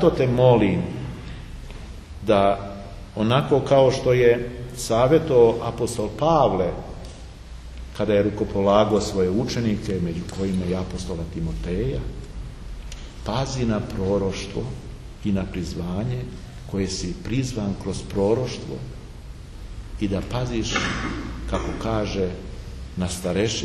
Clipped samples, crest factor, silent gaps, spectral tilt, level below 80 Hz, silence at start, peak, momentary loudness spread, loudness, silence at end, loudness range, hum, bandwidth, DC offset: under 0.1%; 20 dB; none; -6 dB/octave; -36 dBFS; 0 s; -4 dBFS; 20 LU; -23 LUFS; 0 s; 9 LU; none; 13 kHz; under 0.1%